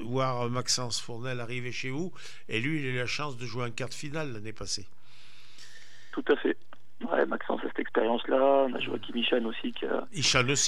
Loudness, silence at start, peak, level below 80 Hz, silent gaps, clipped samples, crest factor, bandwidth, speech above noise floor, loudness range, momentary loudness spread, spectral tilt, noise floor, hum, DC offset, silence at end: -30 LUFS; 0 s; -8 dBFS; -62 dBFS; none; under 0.1%; 22 dB; 14 kHz; 27 dB; 7 LU; 13 LU; -3.5 dB/octave; -57 dBFS; none; 2%; 0 s